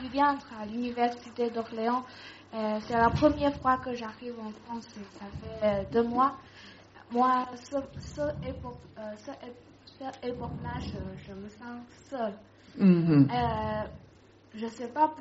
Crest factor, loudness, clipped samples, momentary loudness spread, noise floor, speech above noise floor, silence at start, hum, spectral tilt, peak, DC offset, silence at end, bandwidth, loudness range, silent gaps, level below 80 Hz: 20 dB; -29 LUFS; under 0.1%; 20 LU; -56 dBFS; 26 dB; 0 s; none; -6 dB/octave; -10 dBFS; under 0.1%; 0 s; 7.6 kHz; 11 LU; none; -52 dBFS